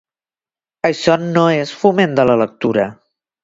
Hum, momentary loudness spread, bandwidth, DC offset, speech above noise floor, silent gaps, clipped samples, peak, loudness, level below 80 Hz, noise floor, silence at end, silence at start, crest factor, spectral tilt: none; 6 LU; 7.8 kHz; under 0.1%; over 76 dB; none; under 0.1%; 0 dBFS; -15 LUFS; -54 dBFS; under -90 dBFS; 0.5 s; 0.85 s; 16 dB; -6 dB/octave